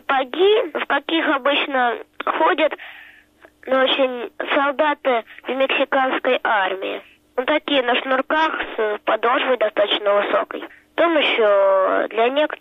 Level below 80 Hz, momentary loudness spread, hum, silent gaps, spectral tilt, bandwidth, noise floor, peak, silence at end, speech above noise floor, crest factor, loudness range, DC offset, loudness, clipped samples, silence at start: -62 dBFS; 10 LU; none; none; -4.5 dB/octave; 6.2 kHz; -51 dBFS; -8 dBFS; 0.05 s; 32 dB; 12 dB; 3 LU; under 0.1%; -19 LUFS; under 0.1%; 0.1 s